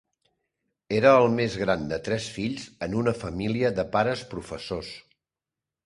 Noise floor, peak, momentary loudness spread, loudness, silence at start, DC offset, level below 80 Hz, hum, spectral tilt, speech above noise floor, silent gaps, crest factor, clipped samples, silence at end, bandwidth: -89 dBFS; -4 dBFS; 15 LU; -25 LUFS; 0.9 s; under 0.1%; -52 dBFS; none; -6 dB/octave; 64 dB; none; 22 dB; under 0.1%; 0.85 s; 11.5 kHz